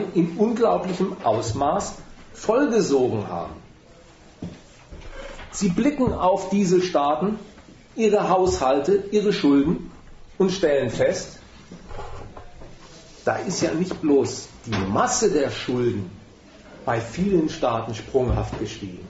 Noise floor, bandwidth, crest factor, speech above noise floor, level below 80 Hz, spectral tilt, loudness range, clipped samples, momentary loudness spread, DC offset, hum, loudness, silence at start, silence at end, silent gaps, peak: -49 dBFS; 8 kHz; 16 dB; 27 dB; -42 dBFS; -5.5 dB/octave; 5 LU; under 0.1%; 19 LU; under 0.1%; none; -22 LUFS; 0 s; 0 s; none; -6 dBFS